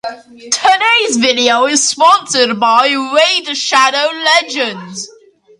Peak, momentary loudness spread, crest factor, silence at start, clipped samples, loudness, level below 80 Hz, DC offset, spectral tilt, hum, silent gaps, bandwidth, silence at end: 0 dBFS; 10 LU; 12 dB; 0.05 s; under 0.1%; -11 LUFS; -62 dBFS; under 0.1%; -1 dB/octave; none; none; 11.5 kHz; 0.5 s